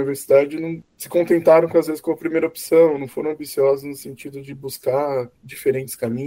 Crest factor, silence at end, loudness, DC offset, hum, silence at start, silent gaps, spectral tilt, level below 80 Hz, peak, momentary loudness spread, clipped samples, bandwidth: 18 dB; 0 s; -19 LUFS; under 0.1%; none; 0 s; none; -6 dB/octave; -62 dBFS; -2 dBFS; 18 LU; under 0.1%; 16 kHz